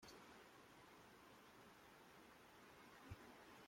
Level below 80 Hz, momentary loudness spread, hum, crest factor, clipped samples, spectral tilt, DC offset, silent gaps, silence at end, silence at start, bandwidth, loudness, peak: -78 dBFS; 4 LU; none; 22 dB; under 0.1%; -4 dB/octave; under 0.1%; none; 0 s; 0 s; 16.5 kHz; -64 LUFS; -42 dBFS